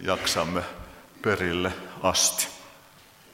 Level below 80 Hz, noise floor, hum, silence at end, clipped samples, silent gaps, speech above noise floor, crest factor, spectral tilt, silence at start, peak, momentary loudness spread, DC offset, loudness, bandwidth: -54 dBFS; -53 dBFS; none; 0.55 s; under 0.1%; none; 27 dB; 20 dB; -2.5 dB/octave; 0 s; -8 dBFS; 20 LU; under 0.1%; -26 LUFS; 16.5 kHz